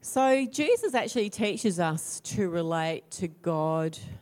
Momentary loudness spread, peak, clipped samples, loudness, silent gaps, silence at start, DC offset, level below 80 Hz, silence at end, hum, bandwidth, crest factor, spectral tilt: 8 LU; -12 dBFS; under 0.1%; -28 LUFS; none; 0.05 s; under 0.1%; -64 dBFS; 0 s; none; 16.5 kHz; 14 dB; -5 dB/octave